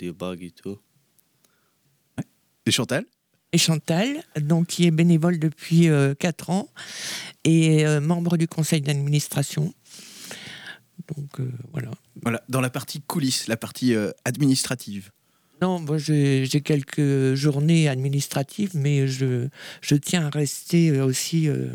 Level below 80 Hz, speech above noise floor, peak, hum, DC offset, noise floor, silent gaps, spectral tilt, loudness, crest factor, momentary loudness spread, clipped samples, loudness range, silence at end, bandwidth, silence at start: -66 dBFS; 44 dB; -6 dBFS; none; under 0.1%; -66 dBFS; none; -5.5 dB/octave; -23 LUFS; 16 dB; 18 LU; under 0.1%; 8 LU; 0 s; 19 kHz; 0 s